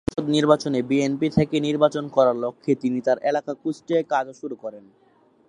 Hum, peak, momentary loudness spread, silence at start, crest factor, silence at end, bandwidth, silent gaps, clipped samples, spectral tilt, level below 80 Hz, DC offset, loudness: none; -2 dBFS; 11 LU; 0.1 s; 20 dB; 0.7 s; 11 kHz; none; under 0.1%; -6.5 dB/octave; -52 dBFS; under 0.1%; -22 LUFS